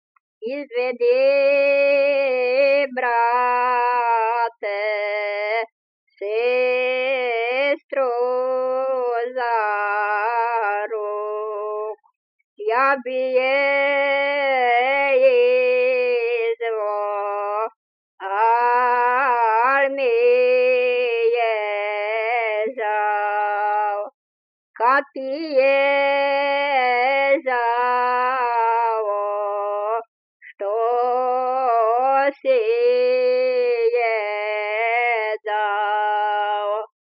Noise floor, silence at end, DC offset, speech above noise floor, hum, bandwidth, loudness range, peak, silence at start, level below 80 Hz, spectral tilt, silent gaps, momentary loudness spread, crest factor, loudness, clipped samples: under -90 dBFS; 0.2 s; under 0.1%; over 72 dB; none; 5.4 kHz; 4 LU; -6 dBFS; 0.4 s; under -90 dBFS; -4 dB/octave; 5.72-6.07 s, 7.84-7.89 s, 12.16-12.56 s, 17.76-18.18 s, 24.14-24.74 s, 30.08-30.40 s; 8 LU; 14 dB; -20 LUFS; under 0.1%